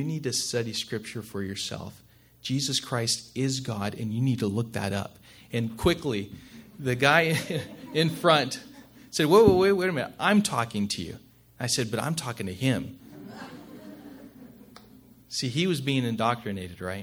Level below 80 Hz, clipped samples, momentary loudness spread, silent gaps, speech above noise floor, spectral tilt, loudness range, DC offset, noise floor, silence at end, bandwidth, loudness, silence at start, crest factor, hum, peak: -54 dBFS; under 0.1%; 21 LU; none; 27 dB; -4.5 dB/octave; 9 LU; under 0.1%; -53 dBFS; 0 s; over 20 kHz; -26 LUFS; 0 s; 24 dB; none; -4 dBFS